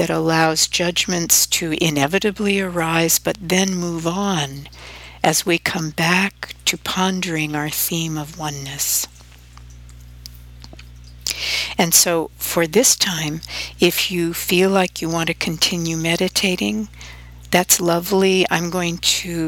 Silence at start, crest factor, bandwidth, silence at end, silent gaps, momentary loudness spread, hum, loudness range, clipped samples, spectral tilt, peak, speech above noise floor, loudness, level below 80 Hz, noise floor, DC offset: 0 s; 20 dB; 19 kHz; 0 s; none; 11 LU; 60 Hz at -45 dBFS; 6 LU; under 0.1%; -3 dB/octave; 0 dBFS; 23 dB; -18 LUFS; -44 dBFS; -42 dBFS; under 0.1%